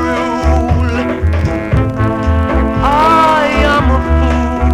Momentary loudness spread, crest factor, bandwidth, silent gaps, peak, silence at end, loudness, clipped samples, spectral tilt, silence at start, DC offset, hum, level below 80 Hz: 6 LU; 12 dB; 10.5 kHz; none; 0 dBFS; 0 s; -12 LUFS; under 0.1%; -7 dB/octave; 0 s; under 0.1%; none; -16 dBFS